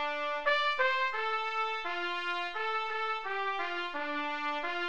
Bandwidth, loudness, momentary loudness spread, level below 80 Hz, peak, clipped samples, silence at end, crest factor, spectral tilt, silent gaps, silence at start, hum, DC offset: 9.4 kHz; -32 LUFS; 6 LU; -72 dBFS; -16 dBFS; under 0.1%; 0 s; 18 dB; -2 dB/octave; none; 0 s; none; 0.4%